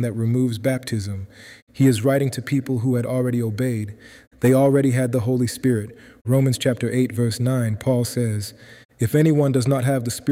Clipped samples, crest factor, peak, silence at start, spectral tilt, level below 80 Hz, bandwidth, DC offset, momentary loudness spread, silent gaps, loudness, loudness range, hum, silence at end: under 0.1%; 14 dB; -6 dBFS; 0 s; -6.5 dB/octave; -56 dBFS; 16 kHz; under 0.1%; 10 LU; 1.62-1.67 s, 4.27-4.31 s, 6.21-6.25 s, 8.85-8.89 s; -21 LUFS; 2 LU; none; 0 s